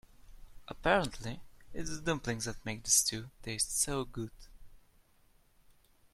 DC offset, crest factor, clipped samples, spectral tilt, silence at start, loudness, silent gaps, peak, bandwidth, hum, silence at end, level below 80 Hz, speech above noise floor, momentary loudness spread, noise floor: under 0.1%; 24 dB; under 0.1%; -2.5 dB/octave; 0.2 s; -33 LUFS; none; -12 dBFS; 16 kHz; none; 1.35 s; -52 dBFS; 32 dB; 18 LU; -66 dBFS